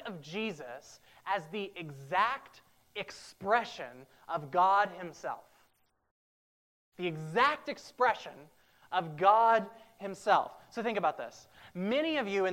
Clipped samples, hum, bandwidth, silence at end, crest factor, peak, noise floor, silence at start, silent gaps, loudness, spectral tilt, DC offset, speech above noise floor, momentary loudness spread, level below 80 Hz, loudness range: under 0.1%; none; 16 kHz; 0 s; 22 dB; -12 dBFS; -71 dBFS; 0 s; 6.11-6.92 s; -32 LUFS; -5 dB/octave; under 0.1%; 39 dB; 18 LU; -76 dBFS; 5 LU